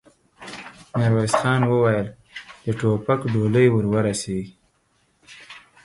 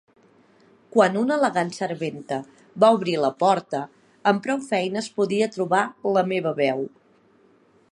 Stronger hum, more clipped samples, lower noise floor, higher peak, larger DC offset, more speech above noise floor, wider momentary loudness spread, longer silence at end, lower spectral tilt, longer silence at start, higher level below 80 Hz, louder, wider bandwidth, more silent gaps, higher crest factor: neither; neither; first, -65 dBFS vs -58 dBFS; about the same, -2 dBFS vs -4 dBFS; neither; first, 45 dB vs 36 dB; first, 22 LU vs 12 LU; second, 0.25 s vs 1.05 s; about the same, -6.5 dB/octave vs -5.5 dB/octave; second, 0.4 s vs 0.95 s; first, -52 dBFS vs -74 dBFS; about the same, -21 LUFS vs -23 LUFS; about the same, 11.5 kHz vs 11 kHz; neither; about the same, 20 dB vs 20 dB